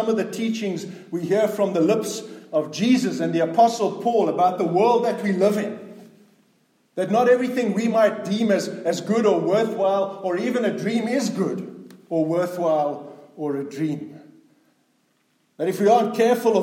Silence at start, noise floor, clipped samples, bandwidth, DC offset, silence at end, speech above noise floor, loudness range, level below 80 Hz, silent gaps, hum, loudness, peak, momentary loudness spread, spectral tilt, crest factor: 0 s; -66 dBFS; under 0.1%; 16.5 kHz; under 0.1%; 0 s; 45 dB; 6 LU; -78 dBFS; none; none; -22 LUFS; -4 dBFS; 12 LU; -5.5 dB/octave; 16 dB